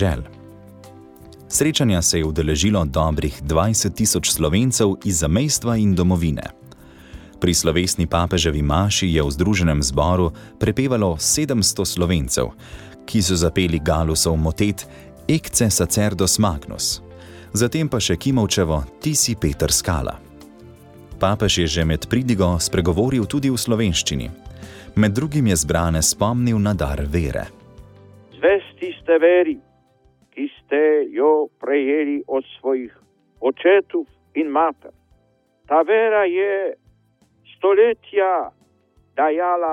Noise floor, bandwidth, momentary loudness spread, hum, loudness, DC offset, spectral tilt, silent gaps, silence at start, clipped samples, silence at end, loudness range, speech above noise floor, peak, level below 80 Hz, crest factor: -61 dBFS; 17.5 kHz; 9 LU; none; -19 LUFS; under 0.1%; -4.5 dB/octave; none; 0 s; under 0.1%; 0 s; 3 LU; 43 dB; -4 dBFS; -34 dBFS; 16 dB